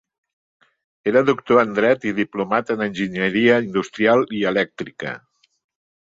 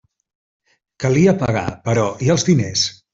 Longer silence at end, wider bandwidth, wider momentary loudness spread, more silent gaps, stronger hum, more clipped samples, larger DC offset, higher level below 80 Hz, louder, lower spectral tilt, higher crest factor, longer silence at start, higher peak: first, 0.95 s vs 0.2 s; about the same, 7.8 kHz vs 7.8 kHz; first, 12 LU vs 6 LU; neither; neither; neither; neither; second, -62 dBFS vs -48 dBFS; about the same, -19 LUFS vs -17 LUFS; about the same, -6 dB/octave vs -5 dB/octave; about the same, 18 dB vs 16 dB; about the same, 1.05 s vs 1 s; about the same, -2 dBFS vs -2 dBFS